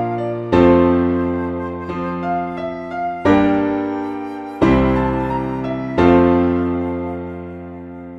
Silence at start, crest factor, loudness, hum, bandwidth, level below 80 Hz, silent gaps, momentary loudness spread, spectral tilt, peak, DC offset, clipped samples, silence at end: 0 s; 18 dB; -18 LUFS; none; 7.2 kHz; -36 dBFS; none; 15 LU; -9 dB/octave; 0 dBFS; under 0.1%; under 0.1%; 0 s